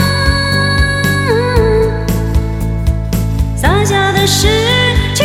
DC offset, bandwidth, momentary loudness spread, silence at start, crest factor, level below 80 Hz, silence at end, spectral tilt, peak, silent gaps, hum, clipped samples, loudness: under 0.1%; 16.5 kHz; 6 LU; 0 s; 12 dB; -18 dBFS; 0 s; -4.5 dB/octave; 0 dBFS; none; none; under 0.1%; -12 LUFS